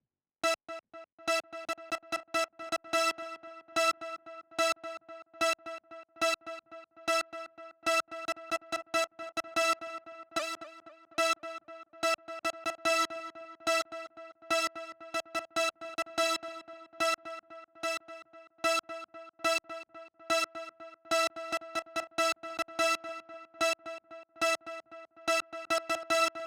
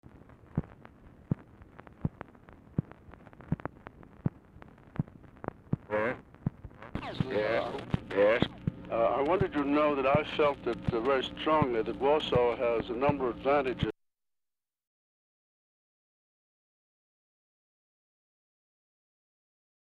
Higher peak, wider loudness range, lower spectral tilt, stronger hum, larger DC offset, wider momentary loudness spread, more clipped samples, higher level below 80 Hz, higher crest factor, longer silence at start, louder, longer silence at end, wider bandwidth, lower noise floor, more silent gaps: second, -14 dBFS vs -8 dBFS; second, 2 LU vs 12 LU; second, -0.5 dB/octave vs -8 dB/octave; neither; neither; about the same, 16 LU vs 14 LU; neither; second, -76 dBFS vs -54 dBFS; about the same, 20 dB vs 24 dB; about the same, 0.45 s vs 0.55 s; about the same, -33 LUFS vs -31 LUFS; second, 0 s vs 6 s; first, over 20 kHz vs 9.8 kHz; second, -54 dBFS vs -90 dBFS; first, 1.12-1.18 s vs none